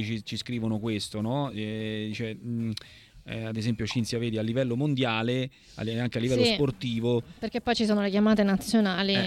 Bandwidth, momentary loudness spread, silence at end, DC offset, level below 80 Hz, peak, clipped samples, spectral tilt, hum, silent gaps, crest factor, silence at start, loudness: 13.5 kHz; 10 LU; 0 s; under 0.1%; -56 dBFS; -10 dBFS; under 0.1%; -6 dB/octave; none; none; 18 dB; 0 s; -28 LUFS